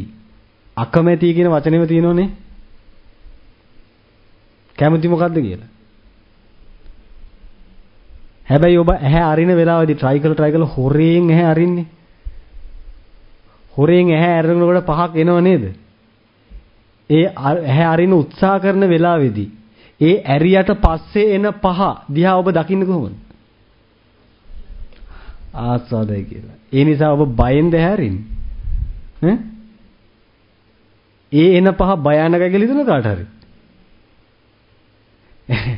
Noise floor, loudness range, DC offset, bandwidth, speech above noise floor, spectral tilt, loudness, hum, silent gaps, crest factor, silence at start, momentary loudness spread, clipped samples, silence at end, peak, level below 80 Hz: -54 dBFS; 8 LU; under 0.1%; 5.4 kHz; 40 dB; -11 dB/octave; -15 LUFS; none; none; 16 dB; 0 s; 14 LU; under 0.1%; 0 s; 0 dBFS; -32 dBFS